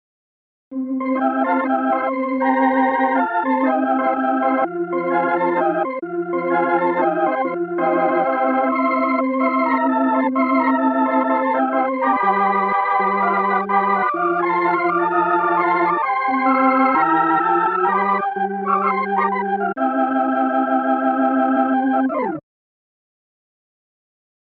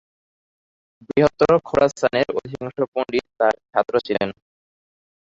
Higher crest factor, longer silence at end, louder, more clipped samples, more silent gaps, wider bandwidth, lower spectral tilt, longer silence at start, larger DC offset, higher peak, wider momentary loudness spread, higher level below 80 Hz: second, 14 dB vs 20 dB; first, 2.1 s vs 1 s; first, -18 LUFS vs -21 LUFS; neither; second, none vs 2.88-2.92 s; second, 4.5 kHz vs 7.8 kHz; first, -9 dB/octave vs -6 dB/octave; second, 0.7 s vs 1.1 s; neither; about the same, -4 dBFS vs -2 dBFS; second, 5 LU vs 9 LU; second, -72 dBFS vs -54 dBFS